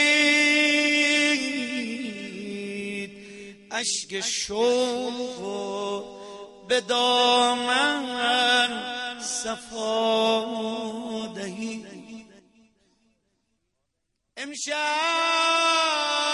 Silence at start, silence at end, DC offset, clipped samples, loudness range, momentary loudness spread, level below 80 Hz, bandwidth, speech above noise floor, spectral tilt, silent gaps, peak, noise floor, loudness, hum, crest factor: 0 s; 0 s; under 0.1%; under 0.1%; 12 LU; 16 LU; -68 dBFS; 12 kHz; 54 dB; -1.5 dB/octave; none; -8 dBFS; -78 dBFS; -23 LUFS; none; 18 dB